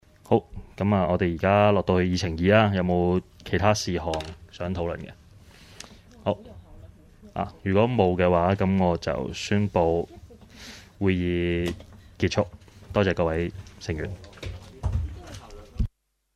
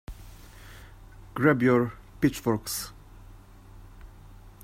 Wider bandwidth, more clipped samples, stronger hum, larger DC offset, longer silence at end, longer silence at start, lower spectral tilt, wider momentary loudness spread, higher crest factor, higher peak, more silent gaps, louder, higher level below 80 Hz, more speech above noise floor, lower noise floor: second, 12.5 kHz vs 16 kHz; neither; neither; neither; first, 0.5 s vs 0.15 s; first, 0.3 s vs 0.1 s; about the same, -6.5 dB/octave vs -5.5 dB/octave; second, 20 LU vs 26 LU; about the same, 20 dB vs 22 dB; about the same, -6 dBFS vs -8 dBFS; neither; about the same, -25 LUFS vs -26 LUFS; first, -42 dBFS vs -48 dBFS; about the same, 27 dB vs 24 dB; about the same, -50 dBFS vs -49 dBFS